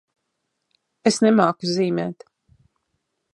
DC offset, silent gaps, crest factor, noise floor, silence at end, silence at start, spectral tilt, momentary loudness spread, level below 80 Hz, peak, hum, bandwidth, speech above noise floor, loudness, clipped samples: under 0.1%; none; 22 dB; -77 dBFS; 1.2 s; 1.05 s; -5 dB/octave; 9 LU; -70 dBFS; -2 dBFS; none; 11 kHz; 57 dB; -20 LUFS; under 0.1%